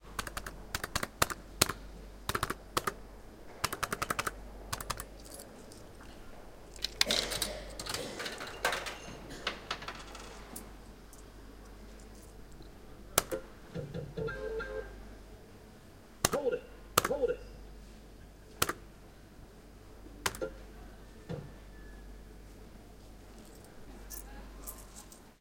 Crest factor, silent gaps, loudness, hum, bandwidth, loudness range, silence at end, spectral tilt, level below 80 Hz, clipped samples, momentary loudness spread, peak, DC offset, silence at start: 36 dB; none; -36 LUFS; none; 17 kHz; 14 LU; 0.05 s; -2.5 dB/octave; -52 dBFS; under 0.1%; 22 LU; -4 dBFS; under 0.1%; 0 s